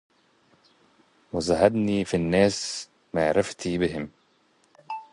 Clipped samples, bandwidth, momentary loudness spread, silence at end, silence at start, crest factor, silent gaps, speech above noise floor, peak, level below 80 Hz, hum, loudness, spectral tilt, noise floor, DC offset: under 0.1%; 11.5 kHz; 14 LU; 0.1 s; 1.35 s; 22 dB; none; 41 dB; -4 dBFS; -52 dBFS; none; -25 LUFS; -5 dB/octave; -64 dBFS; under 0.1%